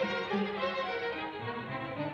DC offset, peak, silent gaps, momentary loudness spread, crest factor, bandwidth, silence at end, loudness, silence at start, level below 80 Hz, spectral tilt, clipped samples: under 0.1%; -20 dBFS; none; 6 LU; 16 dB; 7.6 kHz; 0 s; -35 LUFS; 0 s; -66 dBFS; -6.5 dB/octave; under 0.1%